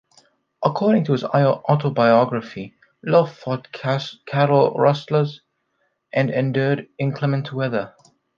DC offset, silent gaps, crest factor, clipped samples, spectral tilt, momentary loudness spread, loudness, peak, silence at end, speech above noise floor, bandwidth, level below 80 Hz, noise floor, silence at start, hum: under 0.1%; none; 18 dB; under 0.1%; -8 dB/octave; 12 LU; -20 LUFS; -2 dBFS; 0.5 s; 51 dB; 7 kHz; -66 dBFS; -70 dBFS; 0.6 s; none